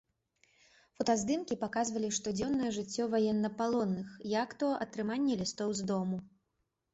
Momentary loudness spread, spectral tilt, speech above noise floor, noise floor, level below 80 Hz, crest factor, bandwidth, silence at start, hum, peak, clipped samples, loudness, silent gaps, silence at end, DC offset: 5 LU; -4.5 dB/octave; 49 dB; -82 dBFS; -68 dBFS; 16 dB; 8.2 kHz; 1 s; none; -18 dBFS; under 0.1%; -34 LUFS; none; 0.65 s; under 0.1%